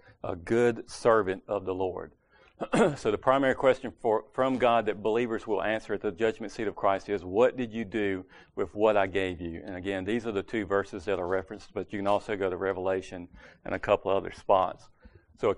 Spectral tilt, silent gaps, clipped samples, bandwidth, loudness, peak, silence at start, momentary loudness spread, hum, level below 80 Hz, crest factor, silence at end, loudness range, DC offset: -6 dB/octave; none; under 0.1%; 10.5 kHz; -29 LUFS; -8 dBFS; 0.25 s; 13 LU; none; -56 dBFS; 20 dB; 0 s; 4 LU; under 0.1%